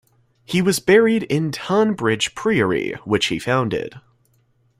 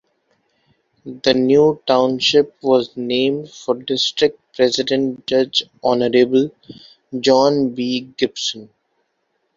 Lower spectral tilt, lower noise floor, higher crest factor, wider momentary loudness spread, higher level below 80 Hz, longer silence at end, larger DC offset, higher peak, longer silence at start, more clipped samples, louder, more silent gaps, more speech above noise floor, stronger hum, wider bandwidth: about the same, -5 dB/octave vs -4.5 dB/octave; second, -61 dBFS vs -69 dBFS; about the same, 18 dB vs 18 dB; about the same, 9 LU vs 9 LU; first, -54 dBFS vs -60 dBFS; about the same, 0.8 s vs 0.9 s; neither; about the same, -2 dBFS vs 0 dBFS; second, 0.5 s vs 1.05 s; neither; about the same, -19 LUFS vs -17 LUFS; neither; second, 42 dB vs 52 dB; neither; first, 16 kHz vs 7.6 kHz